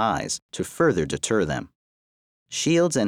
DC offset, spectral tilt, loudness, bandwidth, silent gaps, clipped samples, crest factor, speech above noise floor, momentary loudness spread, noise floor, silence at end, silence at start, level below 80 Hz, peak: under 0.1%; -4.5 dB/octave; -24 LUFS; 16 kHz; 0.42-0.49 s, 1.75-2.46 s; under 0.1%; 16 dB; over 67 dB; 11 LU; under -90 dBFS; 0 s; 0 s; -52 dBFS; -8 dBFS